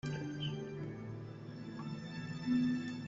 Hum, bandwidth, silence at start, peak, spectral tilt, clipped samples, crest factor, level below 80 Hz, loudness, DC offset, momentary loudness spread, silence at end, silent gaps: none; 7.8 kHz; 0.05 s; -24 dBFS; -7 dB/octave; under 0.1%; 16 dB; -68 dBFS; -40 LUFS; under 0.1%; 13 LU; 0 s; none